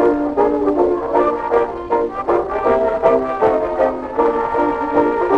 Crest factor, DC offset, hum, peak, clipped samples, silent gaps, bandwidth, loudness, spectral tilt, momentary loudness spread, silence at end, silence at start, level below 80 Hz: 14 dB; 0.1%; none; -2 dBFS; under 0.1%; none; 7 kHz; -17 LUFS; -7.5 dB/octave; 3 LU; 0 s; 0 s; -42 dBFS